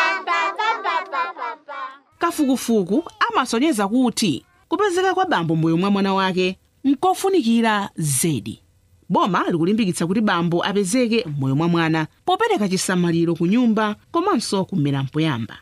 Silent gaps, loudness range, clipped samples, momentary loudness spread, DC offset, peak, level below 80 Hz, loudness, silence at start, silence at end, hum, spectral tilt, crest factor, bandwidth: none; 2 LU; under 0.1%; 6 LU; under 0.1%; -4 dBFS; -60 dBFS; -20 LUFS; 0 s; 0.05 s; none; -5 dB/octave; 16 dB; 15.5 kHz